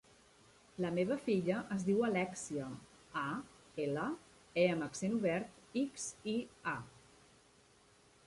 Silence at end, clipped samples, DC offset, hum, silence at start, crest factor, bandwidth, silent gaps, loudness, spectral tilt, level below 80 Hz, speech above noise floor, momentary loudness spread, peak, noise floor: 1.35 s; under 0.1%; under 0.1%; none; 0.8 s; 20 dB; 11.5 kHz; none; -38 LUFS; -5.5 dB/octave; -72 dBFS; 30 dB; 12 LU; -18 dBFS; -67 dBFS